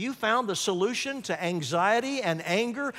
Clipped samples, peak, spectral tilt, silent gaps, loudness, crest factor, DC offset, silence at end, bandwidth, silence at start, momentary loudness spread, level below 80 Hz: under 0.1%; -12 dBFS; -3.5 dB/octave; none; -27 LUFS; 16 dB; under 0.1%; 0 s; 16 kHz; 0 s; 6 LU; -74 dBFS